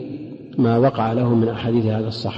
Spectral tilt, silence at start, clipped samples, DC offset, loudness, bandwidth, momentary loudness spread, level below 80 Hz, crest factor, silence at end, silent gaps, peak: -9 dB/octave; 0 s; under 0.1%; under 0.1%; -19 LUFS; 7.6 kHz; 13 LU; -52 dBFS; 14 dB; 0 s; none; -6 dBFS